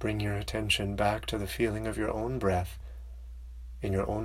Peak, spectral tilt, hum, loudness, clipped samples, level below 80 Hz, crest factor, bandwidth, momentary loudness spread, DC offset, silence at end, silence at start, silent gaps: -14 dBFS; -5.5 dB/octave; none; -31 LUFS; under 0.1%; -42 dBFS; 18 dB; 16 kHz; 18 LU; under 0.1%; 0 s; 0 s; none